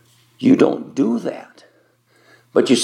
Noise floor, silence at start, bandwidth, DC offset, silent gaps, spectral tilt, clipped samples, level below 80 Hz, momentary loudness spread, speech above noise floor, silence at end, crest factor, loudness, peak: -58 dBFS; 0.4 s; 11 kHz; under 0.1%; none; -5 dB/octave; under 0.1%; -74 dBFS; 12 LU; 41 dB; 0 s; 18 dB; -18 LUFS; 0 dBFS